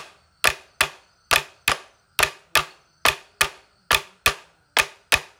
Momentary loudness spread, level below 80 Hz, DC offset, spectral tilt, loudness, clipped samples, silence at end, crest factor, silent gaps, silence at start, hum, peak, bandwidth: 4 LU; -48 dBFS; under 0.1%; -0.5 dB/octave; -22 LUFS; under 0.1%; 0.15 s; 26 dB; none; 0 s; none; 0 dBFS; 17 kHz